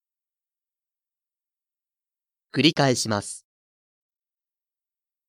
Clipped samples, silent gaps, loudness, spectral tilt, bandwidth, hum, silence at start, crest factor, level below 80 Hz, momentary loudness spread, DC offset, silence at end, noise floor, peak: under 0.1%; none; -22 LUFS; -4 dB/octave; 16 kHz; none; 2.55 s; 26 dB; -70 dBFS; 17 LU; under 0.1%; 1.9 s; under -90 dBFS; -4 dBFS